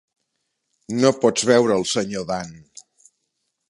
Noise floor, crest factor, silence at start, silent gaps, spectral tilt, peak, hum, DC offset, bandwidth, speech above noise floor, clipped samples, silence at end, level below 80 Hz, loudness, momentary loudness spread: -75 dBFS; 20 dB; 0.9 s; none; -4 dB/octave; -2 dBFS; none; under 0.1%; 11.5 kHz; 56 dB; under 0.1%; 1.1 s; -60 dBFS; -20 LUFS; 12 LU